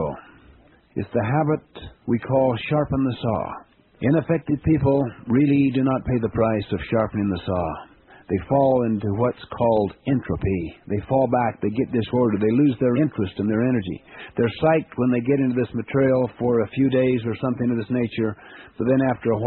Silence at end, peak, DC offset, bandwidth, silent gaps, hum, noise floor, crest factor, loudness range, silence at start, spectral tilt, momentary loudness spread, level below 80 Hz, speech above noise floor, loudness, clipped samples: 0 s; -6 dBFS; under 0.1%; 4.2 kHz; none; none; -52 dBFS; 16 dB; 2 LU; 0 s; -7.5 dB/octave; 9 LU; -46 dBFS; 31 dB; -22 LUFS; under 0.1%